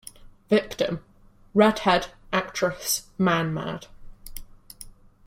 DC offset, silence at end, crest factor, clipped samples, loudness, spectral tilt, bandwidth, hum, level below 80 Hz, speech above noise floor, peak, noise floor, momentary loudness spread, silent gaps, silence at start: under 0.1%; 0.35 s; 24 dB; under 0.1%; -24 LUFS; -4.5 dB/octave; 16.5 kHz; none; -50 dBFS; 31 dB; -4 dBFS; -54 dBFS; 24 LU; none; 0.2 s